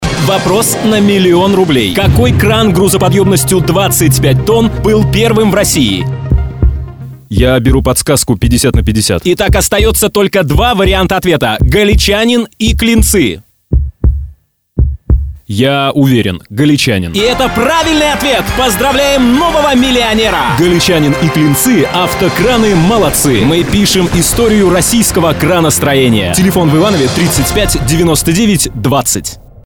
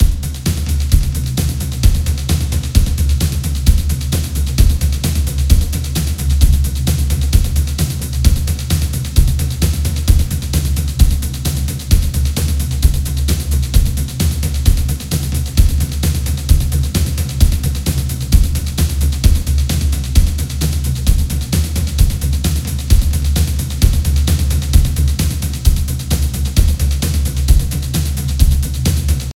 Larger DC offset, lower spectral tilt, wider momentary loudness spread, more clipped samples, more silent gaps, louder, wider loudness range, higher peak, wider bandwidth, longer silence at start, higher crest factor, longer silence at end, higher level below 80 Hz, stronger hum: neither; about the same, -4.5 dB/octave vs -5 dB/octave; about the same, 6 LU vs 4 LU; second, under 0.1% vs 0.2%; neither; first, -9 LUFS vs -16 LUFS; about the same, 3 LU vs 1 LU; about the same, 0 dBFS vs 0 dBFS; first, over 20 kHz vs 16.5 kHz; about the same, 0 s vs 0 s; about the same, 10 dB vs 14 dB; first, 0.25 s vs 0.05 s; about the same, -20 dBFS vs -16 dBFS; neither